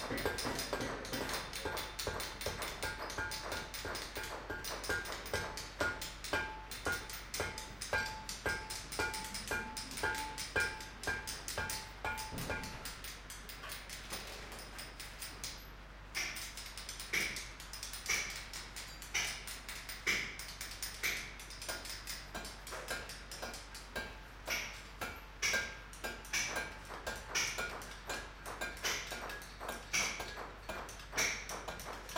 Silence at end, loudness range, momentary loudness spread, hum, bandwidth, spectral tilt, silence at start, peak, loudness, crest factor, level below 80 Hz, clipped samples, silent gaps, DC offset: 0 s; 5 LU; 10 LU; none; 17 kHz; -1.5 dB/octave; 0 s; -20 dBFS; -40 LUFS; 22 dB; -54 dBFS; under 0.1%; none; under 0.1%